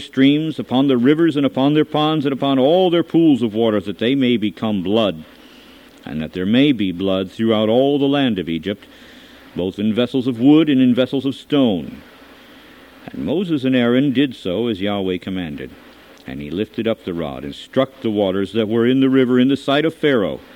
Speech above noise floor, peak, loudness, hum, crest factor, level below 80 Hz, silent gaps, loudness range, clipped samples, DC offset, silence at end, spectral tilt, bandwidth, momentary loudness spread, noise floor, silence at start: 27 dB; -2 dBFS; -17 LUFS; none; 16 dB; -54 dBFS; none; 6 LU; under 0.1%; under 0.1%; 0.15 s; -7.5 dB/octave; 9.4 kHz; 13 LU; -44 dBFS; 0 s